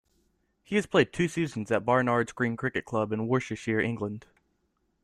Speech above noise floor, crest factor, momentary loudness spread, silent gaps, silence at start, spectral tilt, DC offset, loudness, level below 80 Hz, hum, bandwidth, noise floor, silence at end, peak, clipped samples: 47 dB; 22 dB; 7 LU; none; 0.7 s; -6 dB/octave; under 0.1%; -28 LUFS; -62 dBFS; none; 13 kHz; -74 dBFS; 0.85 s; -8 dBFS; under 0.1%